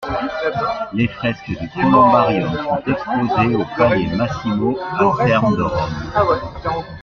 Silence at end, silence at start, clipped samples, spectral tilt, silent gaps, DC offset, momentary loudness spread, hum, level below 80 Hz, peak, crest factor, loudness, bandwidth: 0 s; 0 s; under 0.1%; -7.5 dB/octave; none; under 0.1%; 9 LU; none; -42 dBFS; -2 dBFS; 16 dB; -18 LUFS; 7.2 kHz